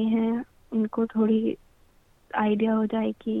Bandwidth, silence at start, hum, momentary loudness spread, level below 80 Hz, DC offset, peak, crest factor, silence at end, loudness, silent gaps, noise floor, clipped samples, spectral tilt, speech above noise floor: 3.8 kHz; 0 s; none; 9 LU; -62 dBFS; under 0.1%; -10 dBFS; 16 dB; 0 s; -26 LUFS; none; -59 dBFS; under 0.1%; -9 dB/octave; 35 dB